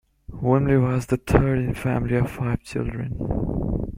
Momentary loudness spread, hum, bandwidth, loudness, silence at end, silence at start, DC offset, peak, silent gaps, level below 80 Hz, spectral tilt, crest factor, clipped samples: 9 LU; none; 15.5 kHz; -23 LUFS; 0 s; 0.3 s; under 0.1%; -2 dBFS; none; -34 dBFS; -8.5 dB/octave; 20 dB; under 0.1%